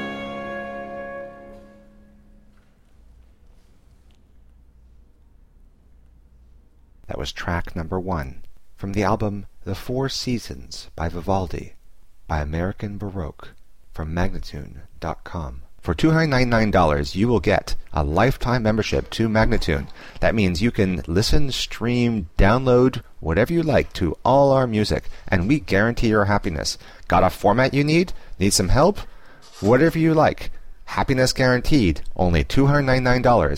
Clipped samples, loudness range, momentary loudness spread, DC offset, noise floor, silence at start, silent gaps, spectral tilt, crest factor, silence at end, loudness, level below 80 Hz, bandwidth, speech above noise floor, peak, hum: under 0.1%; 12 LU; 16 LU; 0.7%; -52 dBFS; 0 s; none; -6 dB/octave; 16 dB; 0 s; -21 LUFS; -32 dBFS; 16 kHz; 33 dB; -6 dBFS; none